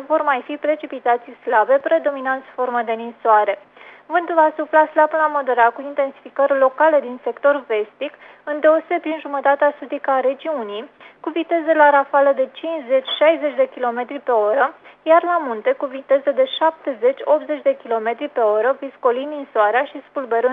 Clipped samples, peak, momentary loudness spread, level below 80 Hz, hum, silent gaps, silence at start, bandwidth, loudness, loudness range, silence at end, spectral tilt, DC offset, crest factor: under 0.1%; 0 dBFS; 10 LU; -80 dBFS; none; none; 0 s; 4 kHz; -18 LUFS; 3 LU; 0 s; -5.5 dB/octave; under 0.1%; 18 dB